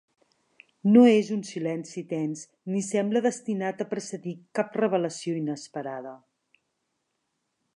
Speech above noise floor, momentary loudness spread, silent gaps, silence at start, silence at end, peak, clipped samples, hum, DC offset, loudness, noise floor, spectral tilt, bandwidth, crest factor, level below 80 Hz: 53 dB; 16 LU; none; 0.85 s; 1.6 s; -6 dBFS; under 0.1%; none; under 0.1%; -26 LUFS; -78 dBFS; -6 dB/octave; 11 kHz; 20 dB; -82 dBFS